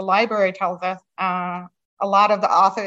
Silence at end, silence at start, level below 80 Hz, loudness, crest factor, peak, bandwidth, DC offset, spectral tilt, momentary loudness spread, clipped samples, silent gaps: 0 s; 0 s; -76 dBFS; -20 LUFS; 18 dB; -2 dBFS; 7.8 kHz; under 0.1%; -5 dB/octave; 12 LU; under 0.1%; 1.85-1.97 s